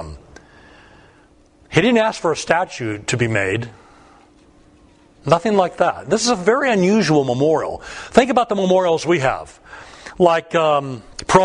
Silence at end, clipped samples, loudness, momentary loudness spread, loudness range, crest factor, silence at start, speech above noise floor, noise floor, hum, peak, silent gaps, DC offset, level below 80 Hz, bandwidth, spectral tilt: 0 s; under 0.1%; -17 LUFS; 15 LU; 5 LU; 18 dB; 0 s; 34 dB; -51 dBFS; none; 0 dBFS; none; under 0.1%; -48 dBFS; 10.5 kHz; -5 dB/octave